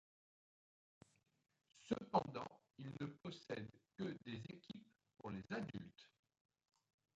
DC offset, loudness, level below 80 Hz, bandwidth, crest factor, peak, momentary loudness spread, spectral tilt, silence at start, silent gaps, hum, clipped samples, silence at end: under 0.1%; -49 LUFS; -80 dBFS; 8.8 kHz; 26 dB; -24 dBFS; 16 LU; -6.5 dB/octave; 1.75 s; none; none; under 0.1%; 1.1 s